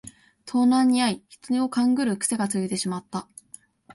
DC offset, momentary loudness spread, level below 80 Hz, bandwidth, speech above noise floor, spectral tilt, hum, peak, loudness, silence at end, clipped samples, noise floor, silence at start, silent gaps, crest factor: under 0.1%; 15 LU; -66 dBFS; 11.5 kHz; 28 dB; -4 dB/octave; none; -10 dBFS; -23 LUFS; 0 s; under 0.1%; -51 dBFS; 0.05 s; none; 14 dB